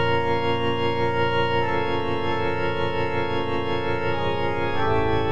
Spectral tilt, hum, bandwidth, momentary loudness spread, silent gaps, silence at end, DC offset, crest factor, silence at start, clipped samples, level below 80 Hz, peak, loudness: -7 dB/octave; none; 9.4 kHz; 3 LU; none; 0 s; 4%; 14 dB; 0 s; under 0.1%; -44 dBFS; -10 dBFS; -24 LUFS